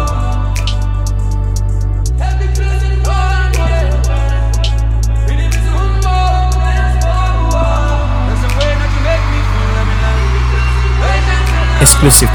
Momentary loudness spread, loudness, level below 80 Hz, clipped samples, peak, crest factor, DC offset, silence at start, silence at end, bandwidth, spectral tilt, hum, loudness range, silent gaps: 4 LU; -13 LUFS; -12 dBFS; 0.3%; 0 dBFS; 10 dB; under 0.1%; 0 s; 0 s; 16.5 kHz; -4 dB/octave; none; 2 LU; none